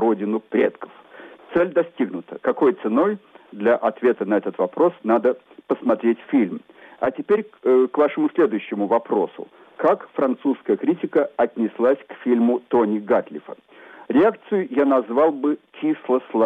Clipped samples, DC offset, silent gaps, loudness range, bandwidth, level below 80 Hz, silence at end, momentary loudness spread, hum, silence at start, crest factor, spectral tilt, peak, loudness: under 0.1%; under 0.1%; none; 1 LU; 4 kHz; -66 dBFS; 0 s; 8 LU; none; 0 s; 12 dB; -9 dB/octave; -8 dBFS; -21 LUFS